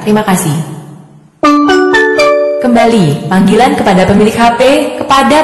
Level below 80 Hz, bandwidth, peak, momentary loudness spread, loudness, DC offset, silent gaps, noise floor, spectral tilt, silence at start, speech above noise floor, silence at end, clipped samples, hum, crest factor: -36 dBFS; 15 kHz; 0 dBFS; 5 LU; -8 LUFS; under 0.1%; none; -35 dBFS; -5.5 dB/octave; 0 s; 28 dB; 0 s; under 0.1%; none; 8 dB